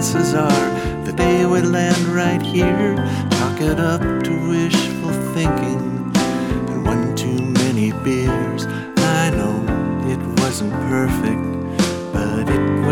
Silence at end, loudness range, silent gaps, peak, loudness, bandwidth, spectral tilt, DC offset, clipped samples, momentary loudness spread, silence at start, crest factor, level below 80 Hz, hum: 0 s; 2 LU; none; 0 dBFS; -18 LUFS; 17.5 kHz; -5.5 dB/octave; under 0.1%; under 0.1%; 5 LU; 0 s; 16 dB; -36 dBFS; none